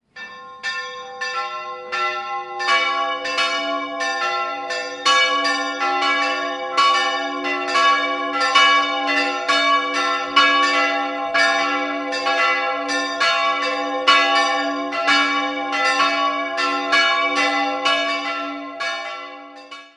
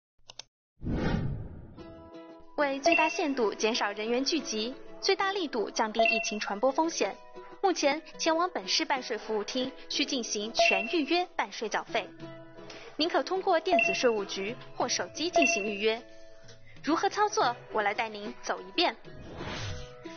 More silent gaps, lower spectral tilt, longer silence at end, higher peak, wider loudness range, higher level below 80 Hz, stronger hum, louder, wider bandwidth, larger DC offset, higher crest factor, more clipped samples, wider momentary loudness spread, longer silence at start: second, none vs 0.48-0.76 s; second, -0.5 dB/octave vs -2 dB/octave; about the same, 0.1 s vs 0 s; first, -2 dBFS vs -12 dBFS; first, 5 LU vs 2 LU; second, -68 dBFS vs -52 dBFS; neither; first, -18 LUFS vs -29 LUFS; first, 11.5 kHz vs 7 kHz; neither; about the same, 18 dB vs 20 dB; neither; second, 11 LU vs 21 LU; second, 0.15 s vs 0.3 s